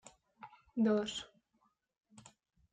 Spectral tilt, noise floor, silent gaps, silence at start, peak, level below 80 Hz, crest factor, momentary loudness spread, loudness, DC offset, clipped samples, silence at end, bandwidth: -5 dB/octave; -78 dBFS; none; 0.4 s; -22 dBFS; -76 dBFS; 18 dB; 25 LU; -36 LUFS; under 0.1%; under 0.1%; 0.5 s; 9.4 kHz